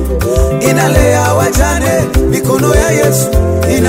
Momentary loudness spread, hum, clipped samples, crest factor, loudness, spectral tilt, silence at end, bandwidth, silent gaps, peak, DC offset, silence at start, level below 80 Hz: 3 LU; none; under 0.1%; 10 dB; -11 LUFS; -5.5 dB/octave; 0 s; 16.5 kHz; none; 0 dBFS; 0.5%; 0 s; -18 dBFS